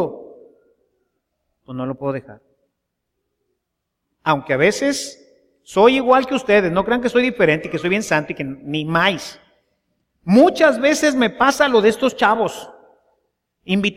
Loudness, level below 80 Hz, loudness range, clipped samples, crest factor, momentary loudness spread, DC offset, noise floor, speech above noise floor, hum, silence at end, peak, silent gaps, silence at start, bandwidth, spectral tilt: -17 LUFS; -54 dBFS; 16 LU; under 0.1%; 18 dB; 14 LU; under 0.1%; -77 dBFS; 60 dB; none; 0.05 s; 0 dBFS; none; 0 s; 16 kHz; -4.5 dB/octave